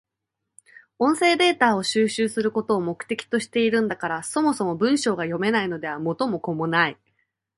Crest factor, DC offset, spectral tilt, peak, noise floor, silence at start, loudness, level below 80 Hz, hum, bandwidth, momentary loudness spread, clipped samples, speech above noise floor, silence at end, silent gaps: 20 dB; under 0.1%; -4.5 dB/octave; -4 dBFS; -82 dBFS; 1 s; -23 LUFS; -66 dBFS; none; 11.5 kHz; 8 LU; under 0.1%; 60 dB; 0.65 s; none